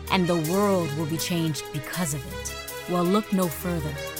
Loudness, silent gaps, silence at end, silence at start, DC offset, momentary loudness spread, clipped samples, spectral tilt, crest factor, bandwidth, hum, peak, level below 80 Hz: -26 LUFS; none; 0 s; 0 s; under 0.1%; 9 LU; under 0.1%; -5 dB/octave; 18 dB; 18 kHz; none; -8 dBFS; -46 dBFS